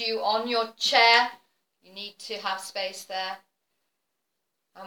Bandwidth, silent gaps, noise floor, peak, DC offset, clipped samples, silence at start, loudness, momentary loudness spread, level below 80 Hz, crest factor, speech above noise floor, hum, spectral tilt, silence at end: 20 kHz; none; -82 dBFS; -4 dBFS; under 0.1%; under 0.1%; 0 s; -24 LUFS; 21 LU; -86 dBFS; 24 dB; 56 dB; none; -0.5 dB/octave; 0 s